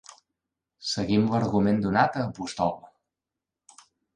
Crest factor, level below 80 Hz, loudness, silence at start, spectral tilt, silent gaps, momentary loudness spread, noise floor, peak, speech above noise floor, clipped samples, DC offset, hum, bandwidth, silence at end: 20 dB; -56 dBFS; -26 LUFS; 0.8 s; -6 dB/octave; none; 9 LU; -88 dBFS; -8 dBFS; 63 dB; under 0.1%; under 0.1%; none; 10 kHz; 1.3 s